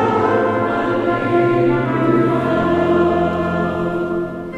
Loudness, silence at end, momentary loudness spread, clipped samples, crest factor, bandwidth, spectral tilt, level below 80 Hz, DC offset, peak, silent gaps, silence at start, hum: -17 LUFS; 0 s; 5 LU; under 0.1%; 12 dB; 7.8 kHz; -8.5 dB/octave; -44 dBFS; under 0.1%; -4 dBFS; none; 0 s; none